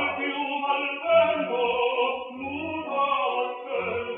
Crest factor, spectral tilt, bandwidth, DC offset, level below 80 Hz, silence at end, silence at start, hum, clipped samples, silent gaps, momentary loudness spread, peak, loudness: 16 dB; -7.5 dB/octave; 4 kHz; under 0.1%; -66 dBFS; 0 s; 0 s; none; under 0.1%; none; 10 LU; -10 dBFS; -26 LUFS